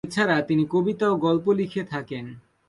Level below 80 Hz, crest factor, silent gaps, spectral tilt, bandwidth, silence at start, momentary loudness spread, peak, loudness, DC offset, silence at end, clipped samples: -62 dBFS; 16 dB; none; -6.5 dB/octave; 11.5 kHz; 0.05 s; 13 LU; -8 dBFS; -23 LUFS; under 0.1%; 0.3 s; under 0.1%